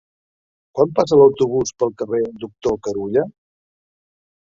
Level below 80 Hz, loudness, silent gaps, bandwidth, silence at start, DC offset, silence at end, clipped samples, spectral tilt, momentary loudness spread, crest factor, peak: -54 dBFS; -18 LUFS; none; 7.6 kHz; 0.75 s; under 0.1%; 1.3 s; under 0.1%; -6 dB/octave; 13 LU; 18 dB; -2 dBFS